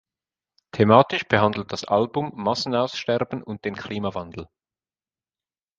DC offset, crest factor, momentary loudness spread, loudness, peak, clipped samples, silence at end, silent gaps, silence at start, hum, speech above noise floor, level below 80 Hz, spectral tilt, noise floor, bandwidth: under 0.1%; 24 dB; 15 LU; -22 LUFS; 0 dBFS; under 0.1%; 1.35 s; none; 0.75 s; none; over 68 dB; -56 dBFS; -6 dB/octave; under -90 dBFS; 7.6 kHz